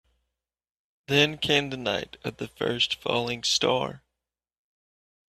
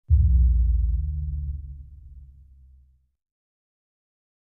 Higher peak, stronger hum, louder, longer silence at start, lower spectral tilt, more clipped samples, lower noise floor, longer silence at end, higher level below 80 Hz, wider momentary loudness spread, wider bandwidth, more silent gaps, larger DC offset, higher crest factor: about the same, -6 dBFS vs -8 dBFS; neither; about the same, -25 LUFS vs -24 LUFS; first, 1.1 s vs 0.1 s; second, -3 dB/octave vs -13.5 dB/octave; neither; first, -87 dBFS vs -57 dBFS; second, 1.3 s vs 2.2 s; second, -60 dBFS vs -26 dBFS; second, 13 LU vs 22 LU; first, 14.5 kHz vs 0.3 kHz; neither; neither; first, 24 dB vs 16 dB